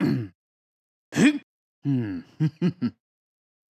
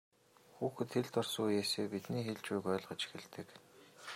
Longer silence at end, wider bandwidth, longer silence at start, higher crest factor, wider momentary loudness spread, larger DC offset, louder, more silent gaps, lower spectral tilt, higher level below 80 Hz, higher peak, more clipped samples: first, 0.8 s vs 0 s; second, 13 kHz vs 16 kHz; second, 0 s vs 0.55 s; about the same, 20 dB vs 18 dB; second, 12 LU vs 16 LU; neither; first, -26 LUFS vs -39 LUFS; first, 0.35-1.12 s, 1.43-1.82 s vs none; first, -6.5 dB/octave vs -4.5 dB/octave; first, -64 dBFS vs -84 dBFS; first, -8 dBFS vs -22 dBFS; neither